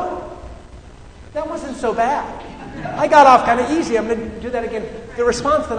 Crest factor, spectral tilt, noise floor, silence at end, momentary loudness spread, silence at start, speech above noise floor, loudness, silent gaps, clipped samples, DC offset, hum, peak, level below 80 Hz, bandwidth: 18 dB; -4.5 dB/octave; -39 dBFS; 0 s; 20 LU; 0 s; 22 dB; -17 LUFS; none; under 0.1%; under 0.1%; none; 0 dBFS; -40 dBFS; 9.6 kHz